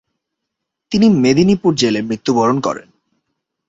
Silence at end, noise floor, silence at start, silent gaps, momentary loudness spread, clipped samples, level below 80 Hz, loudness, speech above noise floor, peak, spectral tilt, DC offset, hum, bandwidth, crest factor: 0.9 s; -78 dBFS; 0.9 s; none; 9 LU; under 0.1%; -52 dBFS; -14 LUFS; 64 dB; -2 dBFS; -6 dB/octave; under 0.1%; none; 8 kHz; 16 dB